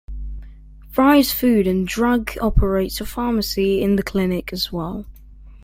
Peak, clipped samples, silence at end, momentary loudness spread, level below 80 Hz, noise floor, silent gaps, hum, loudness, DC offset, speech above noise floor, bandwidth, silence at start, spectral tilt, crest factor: -2 dBFS; under 0.1%; 0.05 s; 16 LU; -30 dBFS; -41 dBFS; none; none; -19 LUFS; under 0.1%; 23 dB; 16.5 kHz; 0.1 s; -5.5 dB/octave; 18 dB